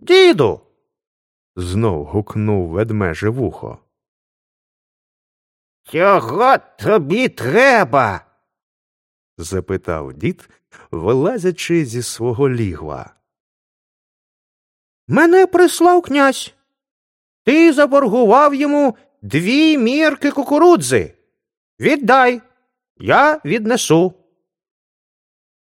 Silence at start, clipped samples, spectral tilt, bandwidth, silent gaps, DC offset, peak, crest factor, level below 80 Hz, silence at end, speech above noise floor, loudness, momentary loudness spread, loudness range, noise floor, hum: 0.05 s; under 0.1%; -5.5 dB/octave; 16 kHz; 1.07-1.54 s, 4.08-5.84 s, 8.63-9.37 s, 13.40-15.07 s, 16.91-17.45 s, 21.57-21.77 s, 22.90-22.95 s; under 0.1%; 0 dBFS; 16 dB; -48 dBFS; 1.65 s; over 76 dB; -15 LUFS; 14 LU; 9 LU; under -90 dBFS; none